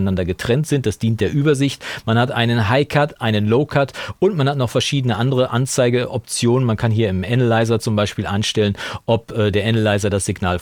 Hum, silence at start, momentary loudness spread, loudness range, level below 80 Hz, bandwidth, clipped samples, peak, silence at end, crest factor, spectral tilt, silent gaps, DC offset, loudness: none; 0 s; 4 LU; 1 LU; -46 dBFS; 16.5 kHz; under 0.1%; -2 dBFS; 0 s; 16 dB; -5.5 dB/octave; none; under 0.1%; -18 LUFS